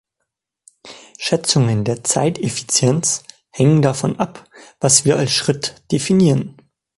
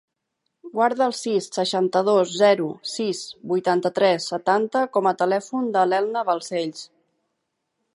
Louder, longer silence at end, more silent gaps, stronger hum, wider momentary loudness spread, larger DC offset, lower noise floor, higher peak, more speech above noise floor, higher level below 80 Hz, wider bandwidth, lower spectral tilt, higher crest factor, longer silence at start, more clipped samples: first, -17 LUFS vs -22 LUFS; second, 0.45 s vs 1.1 s; neither; neither; about the same, 10 LU vs 9 LU; neither; about the same, -77 dBFS vs -78 dBFS; first, 0 dBFS vs -6 dBFS; first, 60 dB vs 56 dB; first, -52 dBFS vs -78 dBFS; about the same, 11.5 kHz vs 11.5 kHz; about the same, -4.5 dB/octave vs -4.5 dB/octave; about the same, 18 dB vs 18 dB; first, 0.85 s vs 0.65 s; neither